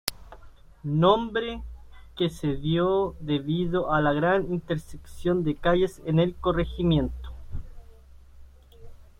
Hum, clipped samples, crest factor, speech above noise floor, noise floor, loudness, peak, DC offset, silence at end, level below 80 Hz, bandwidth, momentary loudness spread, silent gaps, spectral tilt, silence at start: none; under 0.1%; 24 dB; 24 dB; -49 dBFS; -26 LUFS; -2 dBFS; under 0.1%; 0.2 s; -42 dBFS; 16 kHz; 18 LU; none; -6.5 dB/octave; 0.05 s